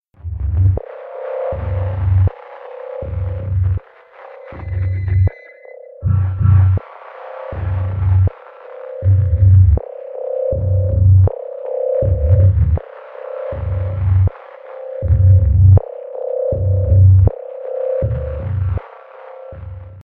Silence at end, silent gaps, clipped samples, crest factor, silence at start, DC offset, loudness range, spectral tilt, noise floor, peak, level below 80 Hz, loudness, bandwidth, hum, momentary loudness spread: 0.1 s; none; under 0.1%; 14 dB; 0.25 s; under 0.1%; 7 LU; -13 dB/octave; -41 dBFS; 0 dBFS; -26 dBFS; -16 LUFS; 2.6 kHz; none; 21 LU